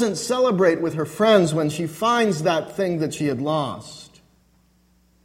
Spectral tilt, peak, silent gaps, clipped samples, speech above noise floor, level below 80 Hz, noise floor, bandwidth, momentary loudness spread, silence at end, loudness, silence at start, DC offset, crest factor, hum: -5 dB/octave; -2 dBFS; none; under 0.1%; 39 dB; -60 dBFS; -60 dBFS; 16.5 kHz; 9 LU; 1.2 s; -21 LUFS; 0 s; under 0.1%; 20 dB; none